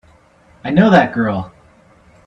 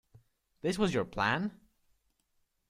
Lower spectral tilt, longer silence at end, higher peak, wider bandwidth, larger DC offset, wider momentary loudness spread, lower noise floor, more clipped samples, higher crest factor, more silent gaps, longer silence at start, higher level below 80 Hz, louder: first, -8 dB/octave vs -5.5 dB/octave; second, 0.8 s vs 1.15 s; first, 0 dBFS vs -14 dBFS; second, 7.4 kHz vs 15 kHz; neither; first, 19 LU vs 7 LU; second, -49 dBFS vs -77 dBFS; neither; second, 16 dB vs 22 dB; neither; about the same, 0.65 s vs 0.65 s; first, -48 dBFS vs -60 dBFS; first, -14 LUFS vs -32 LUFS